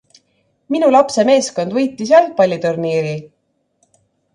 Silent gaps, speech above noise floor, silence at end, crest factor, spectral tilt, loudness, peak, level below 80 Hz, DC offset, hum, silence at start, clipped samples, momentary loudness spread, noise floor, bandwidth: none; 51 dB; 1.1 s; 16 dB; -5 dB/octave; -15 LUFS; 0 dBFS; -64 dBFS; under 0.1%; none; 0.7 s; under 0.1%; 9 LU; -65 dBFS; 11 kHz